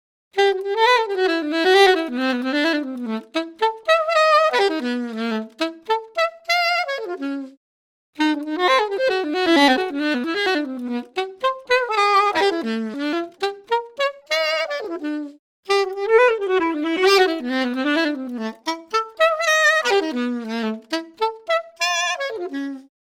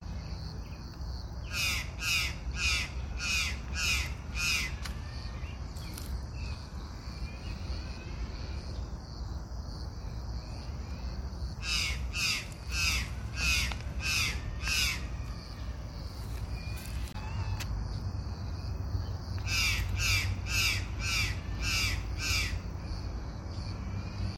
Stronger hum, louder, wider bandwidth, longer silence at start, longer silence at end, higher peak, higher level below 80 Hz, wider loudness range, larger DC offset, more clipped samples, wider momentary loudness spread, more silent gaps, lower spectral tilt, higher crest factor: neither; first, -20 LUFS vs -34 LUFS; about the same, 16.5 kHz vs 16.5 kHz; first, 0.35 s vs 0 s; first, 0.2 s vs 0 s; first, 0 dBFS vs -16 dBFS; second, -66 dBFS vs -40 dBFS; second, 4 LU vs 10 LU; neither; neither; about the same, 12 LU vs 13 LU; first, 7.57-8.13 s, 15.39-15.63 s vs none; about the same, -2.5 dB/octave vs -2.5 dB/octave; about the same, 20 dB vs 18 dB